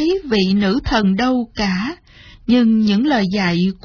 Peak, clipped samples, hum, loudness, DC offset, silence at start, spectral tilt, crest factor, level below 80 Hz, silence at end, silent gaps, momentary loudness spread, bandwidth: -4 dBFS; under 0.1%; none; -16 LUFS; under 0.1%; 0 s; -6.5 dB/octave; 12 dB; -38 dBFS; 0.1 s; none; 8 LU; 5.4 kHz